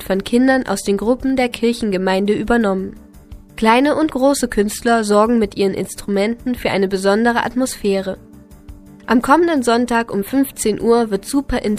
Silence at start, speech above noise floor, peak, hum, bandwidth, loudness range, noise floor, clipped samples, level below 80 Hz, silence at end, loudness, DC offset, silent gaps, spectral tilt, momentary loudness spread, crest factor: 0 s; 23 dB; 0 dBFS; none; 15.5 kHz; 2 LU; -39 dBFS; under 0.1%; -40 dBFS; 0 s; -17 LUFS; under 0.1%; none; -5 dB/octave; 6 LU; 16 dB